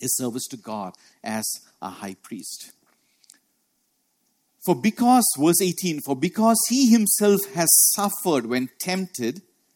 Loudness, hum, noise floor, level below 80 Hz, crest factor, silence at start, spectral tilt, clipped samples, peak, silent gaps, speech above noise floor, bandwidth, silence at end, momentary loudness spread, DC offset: -20 LUFS; none; -71 dBFS; -70 dBFS; 18 dB; 0 s; -3.5 dB/octave; under 0.1%; -4 dBFS; none; 49 dB; 17.5 kHz; 0.35 s; 19 LU; under 0.1%